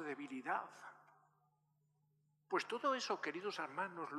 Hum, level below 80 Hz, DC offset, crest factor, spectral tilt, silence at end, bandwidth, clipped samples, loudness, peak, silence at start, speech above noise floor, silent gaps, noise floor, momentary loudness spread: 50 Hz at -80 dBFS; under -90 dBFS; under 0.1%; 22 dB; -3.5 dB/octave; 0 s; 13.5 kHz; under 0.1%; -42 LUFS; -22 dBFS; 0 s; 38 dB; none; -80 dBFS; 12 LU